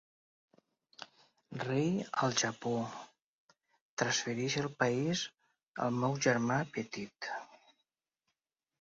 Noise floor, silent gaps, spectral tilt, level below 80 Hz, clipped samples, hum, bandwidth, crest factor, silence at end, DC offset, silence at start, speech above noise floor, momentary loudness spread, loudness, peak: -88 dBFS; 3.24-3.49 s, 3.81-3.97 s, 5.68-5.74 s; -4 dB/octave; -74 dBFS; under 0.1%; none; 7.6 kHz; 22 dB; 1.25 s; under 0.1%; 1 s; 54 dB; 17 LU; -34 LUFS; -16 dBFS